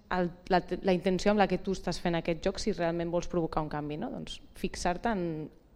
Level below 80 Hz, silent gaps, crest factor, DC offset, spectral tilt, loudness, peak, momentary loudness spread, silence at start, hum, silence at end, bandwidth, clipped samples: -46 dBFS; none; 18 dB; under 0.1%; -6 dB/octave; -31 LUFS; -12 dBFS; 11 LU; 0.1 s; none; 0.25 s; 13 kHz; under 0.1%